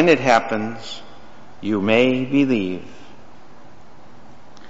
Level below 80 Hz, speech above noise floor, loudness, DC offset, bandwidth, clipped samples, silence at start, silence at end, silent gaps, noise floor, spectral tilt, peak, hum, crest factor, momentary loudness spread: -56 dBFS; 28 dB; -19 LUFS; 2%; 8 kHz; under 0.1%; 0 s; 1.8 s; none; -47 dBFS; -4 dB/octave; -2 dBFS; none; 18 dB; 17 LU